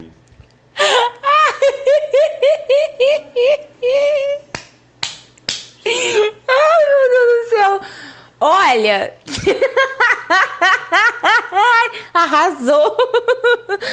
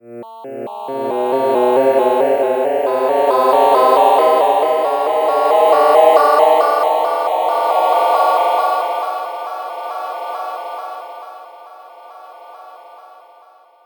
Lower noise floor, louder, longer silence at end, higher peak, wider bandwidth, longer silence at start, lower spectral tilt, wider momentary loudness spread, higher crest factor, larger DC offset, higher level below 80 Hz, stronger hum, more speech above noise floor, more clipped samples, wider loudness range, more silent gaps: about the same, -46 dBFS vs -47 dBFS; about the same, -14 LUFS vs -14 LUFS; second, 0 s vs 0.85 s; about the same, 0 dBFS vs 0 dBFS; second, 9.6 kHz vs 19.5 kHz; about the same, 0 s vs 0.05 s; second, -2 dB/octave vs -4 dB/octave; second, 12 LU vs 17 LU; about the same, 14 dB vs 16 dB; neither; first, -54 dBFS vs -86 dBFS; neither; about the same, 32 dB vs 32 dB; neither; second, 4 LU vs 16 LU; neither